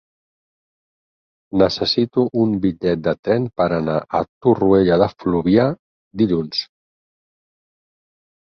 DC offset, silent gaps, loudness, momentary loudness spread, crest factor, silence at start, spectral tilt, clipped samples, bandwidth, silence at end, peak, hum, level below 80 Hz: under 0.1%; 3.19-3.23 s, 4.29-4.41 s, 5.79-6.11 s; -18 LUFS; 10 LU; 18 dB; 1.55 s; -7.5 dB/octave; under 0.1%; 6.8 kHz; 1.85 s; -2 dBFS; none; -48 dBFS